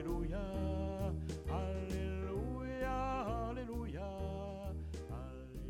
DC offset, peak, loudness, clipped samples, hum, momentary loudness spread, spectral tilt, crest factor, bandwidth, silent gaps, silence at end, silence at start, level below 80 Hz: under 0.1%; -26 dBFS; -42 LUFS; under 0.1%; none; 7 LU; -7.5 dB/octave; 14 dB; 15.5 kHz; none; 0 s; 0 s; -46 dBFS